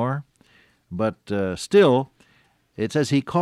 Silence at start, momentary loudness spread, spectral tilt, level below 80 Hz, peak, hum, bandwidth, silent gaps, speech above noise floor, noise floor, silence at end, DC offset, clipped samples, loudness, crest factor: 0 s; 15 LU; -6 dB/octave; -58 dBFS; -6 dBFS; none; 12.5 kHz; none; 41 dB; -61 dBFS; 0 s; under 0.1%; under 0.1%; -22 LUFS; 16 dB